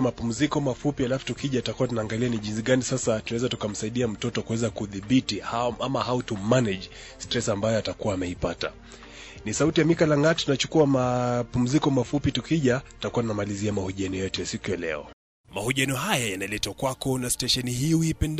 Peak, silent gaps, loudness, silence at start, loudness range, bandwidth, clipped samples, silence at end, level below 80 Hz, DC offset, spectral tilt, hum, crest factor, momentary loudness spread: -8 dBFS; 15.13-15.44 s; -26 LUFS; 0 s; 5 LU; 15.5 kHz; under 0.1%; 0 s; -48 dBFS; under 0.1%; -5 dB/octave; none; 18 dB; 8 LU